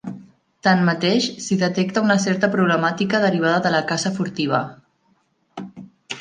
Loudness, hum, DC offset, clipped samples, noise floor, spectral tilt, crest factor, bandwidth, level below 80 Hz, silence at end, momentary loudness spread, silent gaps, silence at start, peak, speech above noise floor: -19 LUFS; none; under 0.1%; under 0.1%; -64 dBFS; -5 dB/octave; 18 dB; 9.6 kHz; -64 dBFS; 0 s; 18 LU; none; 0.05 s; -2 dBFS; 45 dB